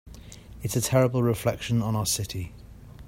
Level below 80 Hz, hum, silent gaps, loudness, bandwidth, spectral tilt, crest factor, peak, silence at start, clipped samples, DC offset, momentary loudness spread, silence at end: -48 dBFS; none; none; -26 LUFS; 16.5 kHz; -5 dB/octave; 18 dB; -10 dBFS; 0.05 s; under 0.1%; under 0.1%; 21 LU; 0 s